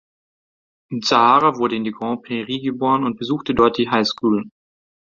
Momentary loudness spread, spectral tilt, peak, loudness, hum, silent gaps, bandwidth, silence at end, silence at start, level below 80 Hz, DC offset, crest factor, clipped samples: 11 LU; -5 dB/octave; -2 dBFS; -19 LUFS; none; none; 7.6 kHz; 0.55 s; 0.9 s; -52 dBFS; under 0.1%; 18 dB; under 0.1%